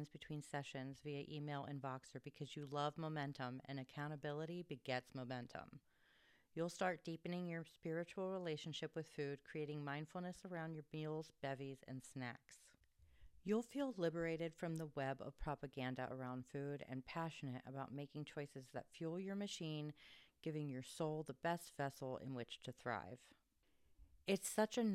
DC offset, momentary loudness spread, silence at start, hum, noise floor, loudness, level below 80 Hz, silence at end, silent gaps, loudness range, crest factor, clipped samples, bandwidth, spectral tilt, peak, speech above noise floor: under 0.1%; 10 LU; 0 s; none; -77 dBFS; -48 LUFS; -72 dBFS; 0 s; none; 3 LU; 22 dB; under 0.1%; 15.5 kHz; -5.5 dB/octave; -26 dBFS; 30 dB